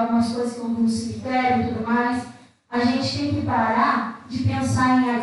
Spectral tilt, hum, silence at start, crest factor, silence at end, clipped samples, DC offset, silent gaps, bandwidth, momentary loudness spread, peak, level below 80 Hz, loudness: -6 dB/octave; none; 0 s; 14 dB; 0 s; under 0.1%; under 0.1%; none; 11.5 kHz; 8 LU; -8 dBFS; -52 dBFS; -22 LUFS